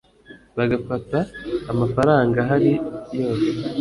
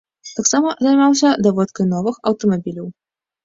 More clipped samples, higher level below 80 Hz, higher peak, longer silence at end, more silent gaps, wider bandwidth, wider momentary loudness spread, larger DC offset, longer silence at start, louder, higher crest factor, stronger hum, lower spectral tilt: neither; first, -48 dBFS vs -58 dBFS; about the same, -4 dBFS vs -2 dBFS; second, 0 s vs 0.55 s; neither; first, 11.5 kHz vs 8 kHz; second, 10 LU vs 15 LU; neither; about the same, 0.3 s vs 0.25 s; second, -21 LUFS vs -16 LUFS; about the same, 18 dB vs 14 dB; neither; first, -8 dB/octave vs -4.5 dB/octave